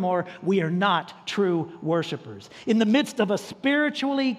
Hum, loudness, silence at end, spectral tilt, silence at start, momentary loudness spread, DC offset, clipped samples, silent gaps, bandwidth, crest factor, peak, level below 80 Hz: none; -24 LUFS; 0 s; -5.5 dB/octave; 0 s; 9 LU; under 0.1%; under 0.1%; none; 13.5 kHz; 16 dB; -8 dBFS; -72 dBFS